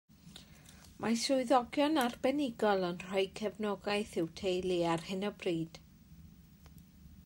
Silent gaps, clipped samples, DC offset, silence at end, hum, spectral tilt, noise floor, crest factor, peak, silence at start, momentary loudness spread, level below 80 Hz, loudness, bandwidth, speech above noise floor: none; under 0.1%; under 0.1%; 0.05 s; none; -4.5 dB/octave; -57 dBFS; 20 dB; -16 dBFS; 0.25 s; 10 LU; -64 dBFS; -34 LUFS; 16 kHz; 24 dB